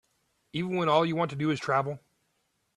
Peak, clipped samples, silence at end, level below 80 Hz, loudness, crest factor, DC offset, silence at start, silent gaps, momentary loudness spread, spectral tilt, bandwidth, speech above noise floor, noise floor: -10 dBFS; under 0.1%; 0.8 s; -70 dBFS; -28 LUFS; 20 dB; under 0.1%; 0.55 s; none; 12 LU; -6.5 dB/octave; 11.5 kHz; 48 dB; -75 dBFS